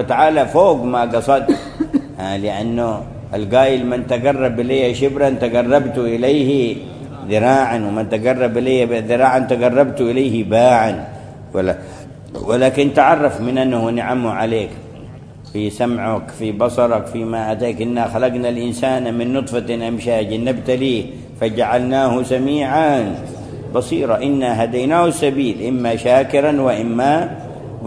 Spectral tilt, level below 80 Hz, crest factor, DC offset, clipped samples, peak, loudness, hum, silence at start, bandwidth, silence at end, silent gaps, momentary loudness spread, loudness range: -6.5 dB/octave; -44 dBFS; 16 dB; under 0.1%; under 0.1%; 0 dBFS; -16 LUFS; none; 0 s; 11 kHz; 0 s; none; 12 LU; 4 LU